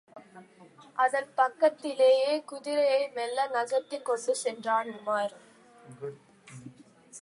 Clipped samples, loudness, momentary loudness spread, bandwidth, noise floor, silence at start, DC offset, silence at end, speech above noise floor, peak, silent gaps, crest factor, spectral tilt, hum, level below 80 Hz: under 0.1%; -28 LUFS; 18 LU; 11.5 kHz; -55 dBFS; 0.15 s; under 0.1%; 0 s; 27 dB; -12 dBFS; none; 18 dB; -3 dB/octave; none; -84 dBFS